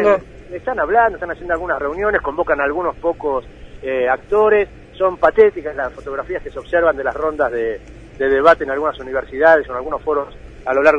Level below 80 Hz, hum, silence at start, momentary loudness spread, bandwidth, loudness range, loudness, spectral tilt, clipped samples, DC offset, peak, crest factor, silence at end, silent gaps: -40 dBFS; none; 0 s; 13 LU; 7.8 kHz; 2 LU; -18 LUFS; -6.5 dB/octave; under 0.1%; under 0.1%; 0 dBFS; 18 dB; 0 s; none